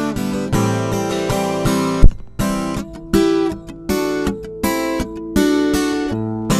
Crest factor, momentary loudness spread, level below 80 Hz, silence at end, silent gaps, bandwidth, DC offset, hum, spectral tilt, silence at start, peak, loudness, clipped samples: 16 dB; 7 LU; -22 dBFS; 0 s; none; 15.5 kHz; under 0.1%; none; -5.5 dB/octave; 0 s; 0 dBFS; -19 LUFS; under 0.1%